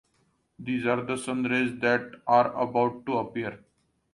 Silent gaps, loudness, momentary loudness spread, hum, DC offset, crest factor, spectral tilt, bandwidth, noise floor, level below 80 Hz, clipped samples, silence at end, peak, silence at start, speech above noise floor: none; -27 LUFS; 10 LU; none; under 0.1%; 18 dB; -5.5 dB/octave; 11.5 kHz; -70 dBFS; -66 dBFS; under 0.1%; 0.55 s; -10 dBFS; 0.6 s; 43 dB